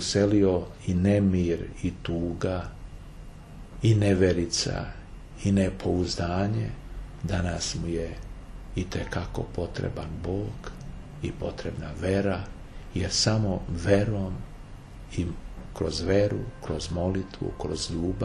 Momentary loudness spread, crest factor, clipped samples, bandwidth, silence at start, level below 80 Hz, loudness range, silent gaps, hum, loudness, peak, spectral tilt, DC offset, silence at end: 20 LU; 20 dB; under 0.1%; 11 kHz; 0 s; -40 dBFS; 6 LU; none; none; -28 LUFS; -8 dBFS; -5.5 dB/octave; under 0.1%; 0 s